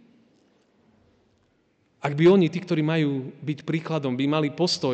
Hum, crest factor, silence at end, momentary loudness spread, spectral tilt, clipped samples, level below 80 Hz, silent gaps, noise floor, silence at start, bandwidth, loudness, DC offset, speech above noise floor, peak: none; 16 dB; 0 s; 13 LU; -6.5 dB/octave; under 0.1%; -72 dBFS; none; -66 dBFS; 2.05 s; 8.8 kHz; -24 LUFS; under 0.1%; 44 dB; -10 dBFS